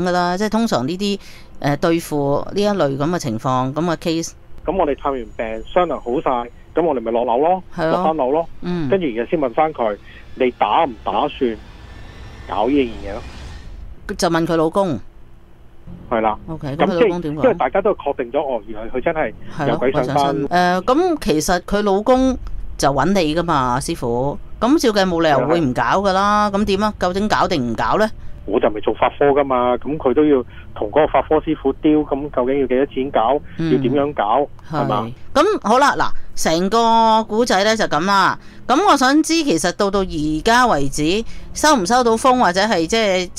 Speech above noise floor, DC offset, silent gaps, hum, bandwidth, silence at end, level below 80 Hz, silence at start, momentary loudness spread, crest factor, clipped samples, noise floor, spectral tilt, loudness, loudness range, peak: 24 dB; under 0.1%; none; none; 16 kHz; 0 s; -36 dBFS; 0 s; 9 LU; 14 dB; under 0.1%; -41 dBFS; -5 dB/octave; -18 LUFS; 5 LU; -2 dBFS